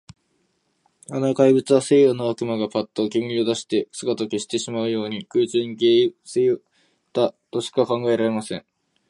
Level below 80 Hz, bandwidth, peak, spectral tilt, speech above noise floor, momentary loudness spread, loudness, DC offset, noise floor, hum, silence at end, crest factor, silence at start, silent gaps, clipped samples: -68 dBFS; 11.5 kHz; -4 dBFS; -5.5 dB/octave; 48 dB; 10 LU; -21 LUFS; under 0.1%; -68 dBFS; none; 0.5 s; 18 dB; 1.1 s; none; under 0.1%